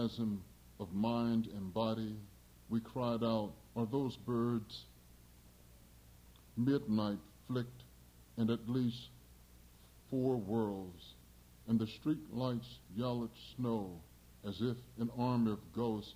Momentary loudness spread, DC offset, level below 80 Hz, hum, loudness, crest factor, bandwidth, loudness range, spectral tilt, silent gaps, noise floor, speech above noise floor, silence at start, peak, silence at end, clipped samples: 15 LU; under 0.1%; -64 dBFS; 60 Hz at -60 dBFS; -38 LUFS; 18 dB; 16 kHz; 3 LU; -8 dB/octave; none; -61 dBFS; 24 dB; 0 s; -22 dBFS; 0 s; under 0.1%